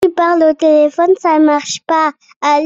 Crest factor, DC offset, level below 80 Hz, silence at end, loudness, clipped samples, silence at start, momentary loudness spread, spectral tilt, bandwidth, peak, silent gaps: 10 dB; under 0.1%; -58 dBFS; 0 s; -12 LUFS; under 0.1%; 0 s; 6 LU; -3 dB/octave; 8 kHz; -2 dBFS; 2.36-2.41 s